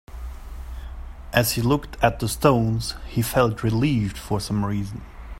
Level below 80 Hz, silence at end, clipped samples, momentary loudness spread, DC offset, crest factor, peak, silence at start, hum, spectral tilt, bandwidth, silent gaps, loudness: -36 dBFS; 0 s; under 0.1%; 18 LU; under 0.1%; 22 dB; -2 dBFS; 0.1 s; none; -5.5 dB/octave; 16.5 kHz; none; -23 LUFS